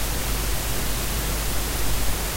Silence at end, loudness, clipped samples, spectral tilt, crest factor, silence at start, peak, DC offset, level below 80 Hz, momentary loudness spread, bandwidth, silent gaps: 0 s; -26 LUFS; under 0.1%; -3 dB/octave; 14 dB; 0 s; -10 dBFS; under 0.1%; -28 dBFS; 0 LU; 16 kHz; none